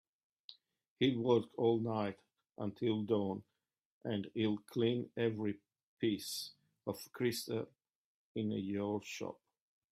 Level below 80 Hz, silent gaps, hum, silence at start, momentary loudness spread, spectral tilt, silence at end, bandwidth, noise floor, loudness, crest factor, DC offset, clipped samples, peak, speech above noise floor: -78 dBFS; 0.90-0.96 s, 3.85-4.01 s, 5.83-5.97 s, 7.95-8.35 s; none; 0.5 s; 15 LU; -6 dB/octave; 0.6 s; 15.5 kHz; -61 dBFS; -38 LUFS; 20 dB; under 0.1%; under 0.1%; -18 dBFS; 25 dB